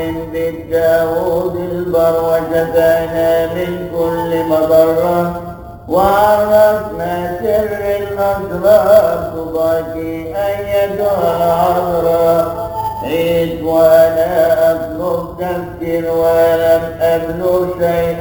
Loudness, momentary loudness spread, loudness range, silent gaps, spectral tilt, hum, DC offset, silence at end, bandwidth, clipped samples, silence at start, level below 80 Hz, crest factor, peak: -14 LUFS; 10 LU; 2 LU; none; -6.5 dB/octave; none; under 0.1%; 0 s; over 20 kHz; under 0.1%; 0 s; -38 dBFS; 14 dB; 0 dBFS